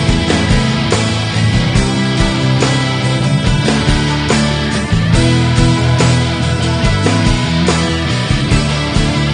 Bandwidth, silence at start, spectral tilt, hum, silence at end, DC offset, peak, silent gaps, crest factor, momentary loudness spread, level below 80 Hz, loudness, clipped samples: 10 kHz; 0 s; -5.5 dB/octave; none; 0 s; under 0.1%; 0 dBFS; none; 12 dB; 3 LU; -22 dBFS; -13 LUFS; under 0.1%